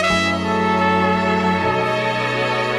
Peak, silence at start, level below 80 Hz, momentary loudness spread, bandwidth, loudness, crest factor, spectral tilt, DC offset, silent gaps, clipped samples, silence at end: -4 dBFS; 0 s; -46 dBFS; 3 LU; 12.5 kHz; -18 LUFS; 14 dB; -5 dB/octave; under 0.1%; none; under 0.1%; 0 s